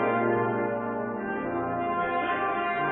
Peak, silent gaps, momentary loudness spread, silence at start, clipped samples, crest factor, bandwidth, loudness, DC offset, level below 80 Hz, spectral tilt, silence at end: -14 dBFS; none; 6 LU; 0 s; under 0.1%; 14 dB; 4.1 kHz; -28 LUFS; under 0.1%; -60 dBFS; -10 dB/octave; 0 s